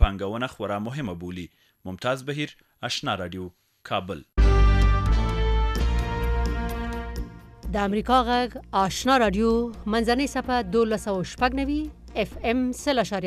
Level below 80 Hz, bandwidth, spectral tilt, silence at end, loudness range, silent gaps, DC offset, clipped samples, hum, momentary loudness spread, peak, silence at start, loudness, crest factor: -28 dBFS; 13 kHz; -5.5 dB/octave; 0 s; 7 LU; none; under 0.1%; under 0.1%; none; 14 LU; -4 dBFS; 0 s; -25 LUFS; 20 dB